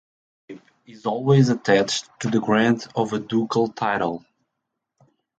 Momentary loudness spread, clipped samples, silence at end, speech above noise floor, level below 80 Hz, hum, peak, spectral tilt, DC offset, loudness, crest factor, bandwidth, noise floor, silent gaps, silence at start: 9 LU; under 0.1%; 1.2 s; 60 dB; -62 dBFS; none; -4 dBFS; -6 dB/octave; under 0.1%; -21 LUFS; 20 dB; 9 kHz; -80 dBFS; none; 0.5 s